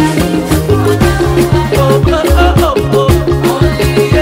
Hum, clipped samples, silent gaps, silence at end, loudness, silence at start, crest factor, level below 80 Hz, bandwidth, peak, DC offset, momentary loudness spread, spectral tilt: none; under 0.1%; none; 0 s; -10 LUFS; 0 s; 8 dB; -18 dBFS; 16.5 kHz; 0 dBFS; under 0.1%; 2 LU; -6.5 dB/octave